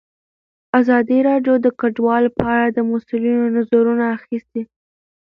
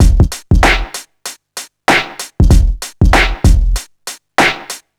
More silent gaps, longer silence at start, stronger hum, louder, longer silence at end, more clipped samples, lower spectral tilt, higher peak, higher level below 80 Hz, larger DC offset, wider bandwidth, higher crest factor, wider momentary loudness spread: neither; first, 0.75 s vs 0 s; neither; second, -17 LUFS vs -13 LUFS; first, 0.6 s vs 0.2 s; neither; first, -9 dB/octave vs -4.5 dB/octave; about the same, 0 dBFS vs 0 dBFS; second, -52 dBFS vs -14 dBFS; neither; second, 4.2 kHz vs 15.5 kHz; first, 18 dB vs 12 dB; second, 11 LU vs 17 LU